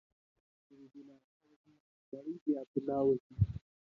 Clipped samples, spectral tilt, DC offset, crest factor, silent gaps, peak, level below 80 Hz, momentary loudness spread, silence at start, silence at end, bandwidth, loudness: under 0.1%; -12 dB/octave; under 0.1%; 22 dB; 1.24-1.40 s, 1.56-1.64 s, 1.80-2.12 s, 2.41-2.46 s, 2.67-2.74 s, 3.20-3.30 s; -16 dBFS; -54 dBFS; 24 LU; 0.8 s; 0.3 s; 4.7 kHz; -35 LUFS